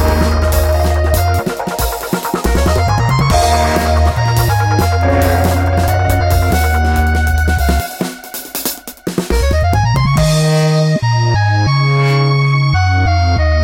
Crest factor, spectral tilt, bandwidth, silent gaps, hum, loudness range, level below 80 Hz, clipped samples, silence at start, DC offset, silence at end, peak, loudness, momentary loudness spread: 12 dB; -5.5 dB/octave; 17 kHz; none; none; 3 LU; -20 dBFS; under 0.1%; 0 s; 0.2%; 0 s; 0 dBFS; -13 LUFS; 7 LU